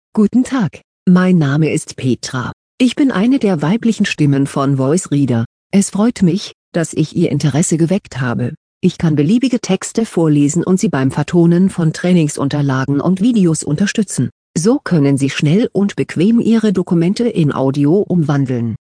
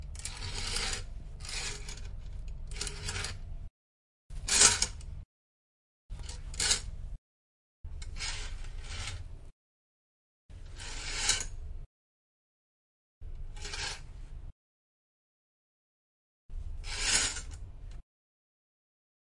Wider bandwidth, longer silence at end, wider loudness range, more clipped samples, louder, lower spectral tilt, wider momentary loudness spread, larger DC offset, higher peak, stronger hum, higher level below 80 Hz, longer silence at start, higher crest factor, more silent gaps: about the same, 10.5 kHz vs 11.5 kHz; second, 0.1 s vs 1.25 s; second, 2 LU vs 15 LU; neither; first, -14 LUFS vs -31 LUFS; first, -6.5 dB/octave vs -0.5 dB/octave; second, 6 LU vs 23 LU; neither; first, 0 dBFS vs -4 dBFS; neither; second, -50 dBFS vs -44 dBFS; first, 0.15 s vs 0 s; second, 12 dB vs 32 dB; second, 0.84-1.06 s, 2.53-2.78 s, 5.46-5.70 s, 6.54-6.72 s, 8.57-8.81 s, 14.32-14.54 s vs 3.70-4.30 s, 5.25-6.09 s, 7.18-7.84 s, 9.52-10.49 s, 11.86-13.21 s, 14.52-16.49 s